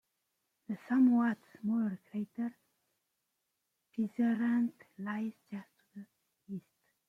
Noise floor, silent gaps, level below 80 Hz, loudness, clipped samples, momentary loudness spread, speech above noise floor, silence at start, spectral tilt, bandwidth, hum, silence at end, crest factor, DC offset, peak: -84 dBFS; none; -84 dBFS; -34 LUFS; under 0.1%; 19 LU; 51 dB; 0.7 s; -8.5 dB/octave; 3.7 kHz; none; 0.5 s; 16 dB; under 0.1%; -18 dBFS